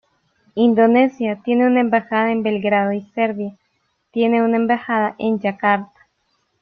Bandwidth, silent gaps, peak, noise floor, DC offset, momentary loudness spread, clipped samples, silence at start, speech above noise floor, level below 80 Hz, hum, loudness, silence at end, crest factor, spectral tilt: 4.8 kHz; none; -2 dBFS; -68 dBFS; under 0.1%; 8 LU; under 0.1%; 0.55 s; 51 dB; -64 dBFS; none; -18 LUFS; 0.75 s; 16 dB; -8.5 dB/octave